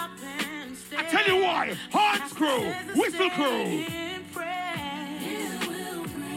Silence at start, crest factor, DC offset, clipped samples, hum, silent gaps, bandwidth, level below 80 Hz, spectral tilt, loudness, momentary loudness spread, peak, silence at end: 0 s; 18 dB; under 0.1%; under 0.1%; none; none; 16 kHz; -64 dBFS; -3.5 dB/octave; -27 LUFS; 11 LU; -10 dBFS; 0 s